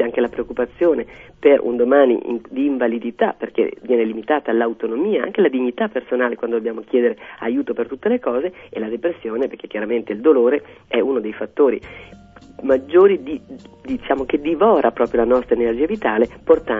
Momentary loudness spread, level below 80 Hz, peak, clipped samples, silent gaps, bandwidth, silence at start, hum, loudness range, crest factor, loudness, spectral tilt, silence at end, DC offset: 11 LU; -50 dBFS; 0 dBFS; under 0.1%; none; 3.8 kHz; 0 s; none; 4 LU; 18 dB; -19 LUFS; -8 dB/octave; 0 s; under 0.1%